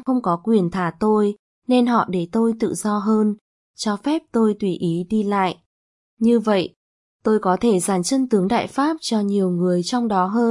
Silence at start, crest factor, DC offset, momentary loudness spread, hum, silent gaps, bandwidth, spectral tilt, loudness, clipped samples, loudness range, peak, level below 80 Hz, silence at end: 0.05 s; 16 dB; under 0.1%; 6 LU; none; 1.39-1.62 s, 3.41-3.74 s, 5.66-6.17 s, 6.76-7.19 s; 11.5 kHz; -6 dB/octave; -20 LUFS; under 0.1%; 2 LU; -4 dBFS; -58 dBFS; 0 s